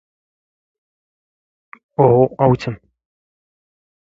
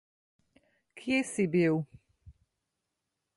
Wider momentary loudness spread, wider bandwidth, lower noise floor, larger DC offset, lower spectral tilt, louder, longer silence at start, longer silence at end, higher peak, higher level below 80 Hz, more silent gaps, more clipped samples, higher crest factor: about the same, 15 LU vs 15 LU; second, 7.6 kHz vs 11.5 kHz; first, under -90 dBFS vs -85 dBFS; neither; first, -9 dB/octave vs -6 dB/octave; first, -15 LUFS vs -30 LUFS; first, 2 s vs 0.95 s; first, 1.4 s vs 1.05 s; first, 0 dBFS vs -16 dBFS; first, -50 dBFS vs -68 dBFS; neither; neither; about the same, 20 dB vs 18 dB